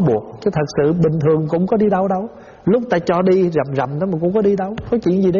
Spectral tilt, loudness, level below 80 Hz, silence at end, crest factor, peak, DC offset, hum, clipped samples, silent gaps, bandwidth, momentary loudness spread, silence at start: -8 dB/octave; -17 LUFS; -46 dBFS; 0 s; 12 dB; -4 dBFS; under 0.1%; none; under 0.1%; none; 7.2 kHz; 6 LU; 0 s